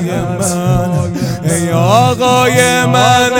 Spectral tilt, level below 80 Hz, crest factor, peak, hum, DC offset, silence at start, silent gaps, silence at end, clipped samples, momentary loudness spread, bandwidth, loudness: -4.5 dB/octave; -36 dBFS; 12 dB; 0 dBFS; none; under 0.1%; 0 s; none; 0 s; 0.4%; 7 LU; 17.5 kHz; -11 LUFS